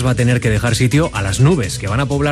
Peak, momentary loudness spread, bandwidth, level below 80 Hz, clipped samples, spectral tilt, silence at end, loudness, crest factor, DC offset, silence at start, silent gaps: 0 dBFS; 4 LU; 13 kHz; -32 dBFS; under 0.1%; -5.5 dB/octave; 0 s; -15 LUFS; 14 dB; under 0.1%; 0 s; none